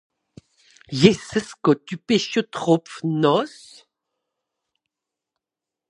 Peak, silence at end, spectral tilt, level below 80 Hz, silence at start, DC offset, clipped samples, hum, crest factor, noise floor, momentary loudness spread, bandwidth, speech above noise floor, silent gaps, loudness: 0 dBFS; 2.4 s; -5.5 dB/octave; -60 dBFS; 0.9 s; under 0.1%; under 0.1%; none; 24 dB; -87 dBFS; 10 LU; 11 kHz; 67 dB; none; -21 LUFS